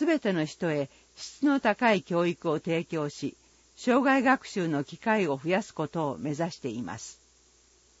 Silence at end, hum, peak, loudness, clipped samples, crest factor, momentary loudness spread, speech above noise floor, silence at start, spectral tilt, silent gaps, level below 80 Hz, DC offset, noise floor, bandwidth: 0.9 s; none; -10 dBFS; -28 LUFS; under 0.1%; 18 dB; 14 LU; 34 dB; 0 s; -5.5 dB/octave; none; -68 dBFS; under 0.1%; -62 dBFS; 8 kHz